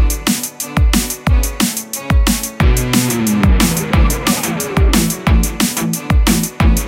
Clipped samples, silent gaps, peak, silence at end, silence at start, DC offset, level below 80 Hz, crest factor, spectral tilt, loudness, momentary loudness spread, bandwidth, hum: under 0.1%; none; 0 dBFS; 0 s; 0 s; under 0.1%; -16 dBFS; 14 dB; -4.5 dB/octave; -15 LUFS; 4 LU; 17 kHz; none